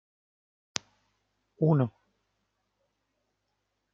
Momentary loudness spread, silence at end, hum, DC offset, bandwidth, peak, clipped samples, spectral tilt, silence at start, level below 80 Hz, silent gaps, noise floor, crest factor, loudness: 12 LU; 2.05 s; 50 Hz at -75 dBFS; under 0.1%; 7.4 kHz; -4 dBFS; under 0.1%; -7 dB/octave; 1.6 s; -76 dBFS; none; -80 dBFS; 30 dB; -30 LUFS